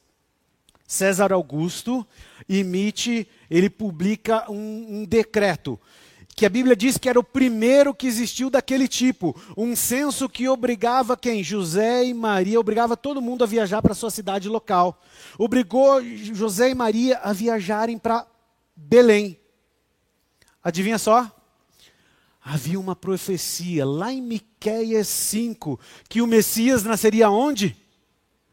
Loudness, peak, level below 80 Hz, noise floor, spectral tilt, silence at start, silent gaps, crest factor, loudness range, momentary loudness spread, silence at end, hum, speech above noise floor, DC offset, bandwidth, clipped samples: -21 LUFS; -2 dBFS; -54 dBFS; -69 dBFS; -4.5 dB/octave; 0.9 s; none; 20 dB; 5 LU; 11 LU; 0.8 s; none; 48 dB; under 0.1%; 16.5 kHz; under 0.1%